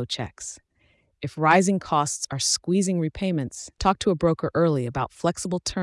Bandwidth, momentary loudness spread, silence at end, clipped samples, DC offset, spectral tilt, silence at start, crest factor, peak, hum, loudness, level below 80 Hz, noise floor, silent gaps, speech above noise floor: 12 kHz; 14 LU; 0 s; under 0.1%; under 0.1%; -4.5 dB/octave; 0 s; 18 dB; -6 dBFS; none; -24 LUFS; -48 dBFS; -65 dBFS; none; 41 dB